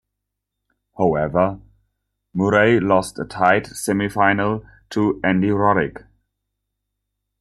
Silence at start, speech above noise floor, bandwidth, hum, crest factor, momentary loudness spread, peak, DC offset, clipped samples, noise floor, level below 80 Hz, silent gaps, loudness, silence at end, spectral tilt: 1 s; 62 dB; 13.5 kHz; 50 Hz at -40 dBFS; 18 dB; 12 LU; -2 dBFS; under 0.1%; under 0.1%; -80 dBFS; -50 dBFS; none; -19 LUFS; 1.45 s; -6 dB/octave